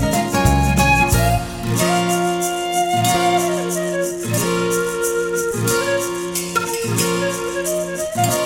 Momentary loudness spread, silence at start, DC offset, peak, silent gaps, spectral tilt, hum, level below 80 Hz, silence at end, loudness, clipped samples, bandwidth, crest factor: 6 LU; 0 s; under 0.1%; -2 dBFS; none; -4.5 dB/octave; none; -30 dBFS; 0 s; -18 LUFS; under 0.1%; 17 kHz; 16 dB